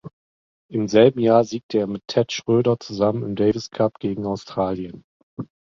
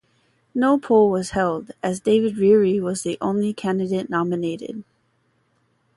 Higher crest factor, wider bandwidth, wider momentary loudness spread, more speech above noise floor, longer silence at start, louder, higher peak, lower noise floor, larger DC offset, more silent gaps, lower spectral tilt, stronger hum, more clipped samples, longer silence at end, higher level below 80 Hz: about the same, 20 dB vs 16 dB; second, 7.4 kHz vs 11.5 kHz; first, 16 LU vs 11 LU; first, over 70 dB vs 46 dB; second, 0.05 s vs 0.55 s; about the same, -21 LUFS vs -21 LUFS; about the same, -2 dBFS vs -4 dBFS; first, under -90 dBFS vs -66 dBFS; neither; first, 0.13-0.69 s, 1.63-1.69 s, 5.04-5.37 s vs none; about the same, -6.5 dB/octave vs -6 dB/octave; neither; neither; second, 0.35 s vs 1.15 s; about the same, -54 dBFS vs -56 dBFS